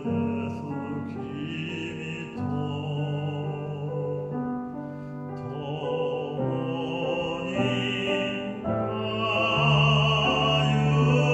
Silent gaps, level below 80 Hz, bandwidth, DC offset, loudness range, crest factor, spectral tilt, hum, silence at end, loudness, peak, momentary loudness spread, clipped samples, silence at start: none; -52 dBFS; 8 kHz; under 0.1%; 8 LU; 16 dB; -6.5 dB/octave; none; 0 s; -27 LUFS; -10 dBFS; 13 LU; under 0.1%; 0 s